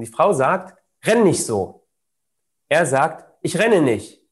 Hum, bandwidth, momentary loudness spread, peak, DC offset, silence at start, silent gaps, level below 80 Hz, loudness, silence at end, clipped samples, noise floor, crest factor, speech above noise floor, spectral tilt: none; 13 kHz; 10 LU; -4 dBFS; under 0.1%; 0 s; none; -64 dBFS; -19 LUFS; 0.25 s; under 0.1%; -80 dBFS; 16 dB; 62 dB; -5 dB/octave